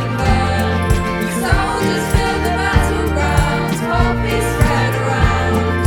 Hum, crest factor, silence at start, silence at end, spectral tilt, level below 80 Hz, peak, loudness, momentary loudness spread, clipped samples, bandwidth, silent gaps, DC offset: none; 14 dB; 0 s; 0 s; -5.5 dB/octave; -22 dBFS; 0 dBFS; -16 LUFS; 2 LU; under 0.1%; 17.5 kHz; none; under 0.1%